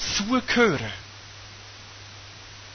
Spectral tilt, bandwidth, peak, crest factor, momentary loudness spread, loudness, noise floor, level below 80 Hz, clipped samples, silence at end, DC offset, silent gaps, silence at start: -3.5 dB/octave; 6.6 kHz; -8 dBFS; 20 dB; 21 LU; -23 LUFS; -44 dBFS; -50 dBFS; under 0.1%; 0 s; under 0.1%; none; 0 s